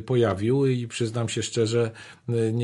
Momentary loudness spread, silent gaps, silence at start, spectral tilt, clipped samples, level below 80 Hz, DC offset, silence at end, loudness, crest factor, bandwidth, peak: 7 LU; none; 0 s; -6 dB/octave; under 0.1%; -54 dBFS; under 0.1%; 0 s; -25 LUFS; 14 dB; 11.5 kHz; -10 dBFS